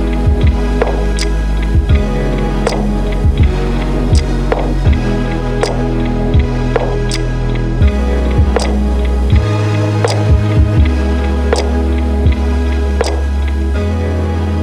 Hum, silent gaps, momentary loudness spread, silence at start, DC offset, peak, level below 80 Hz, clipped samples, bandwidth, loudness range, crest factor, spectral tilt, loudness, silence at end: none; none; 4 LU; 0 s; under 0.1%; 0 dBFS; -14 dBFS; under 0.1%; 11 kHz; 2 LU; 12 dB; -7 dB/octave; -14 LUFS; 0 s